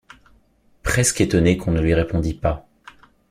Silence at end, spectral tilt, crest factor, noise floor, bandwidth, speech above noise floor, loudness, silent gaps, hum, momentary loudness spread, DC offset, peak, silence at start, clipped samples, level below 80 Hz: 0.7 s; -5 dB/octave; 20 dB; -58 dBFS; 15.5 kHz; 39 dB; -20 LUFS; none; none; 8 LU; under 0.1%; -2 dBFS; 0.85 s; under 0.1%; -34 dBFS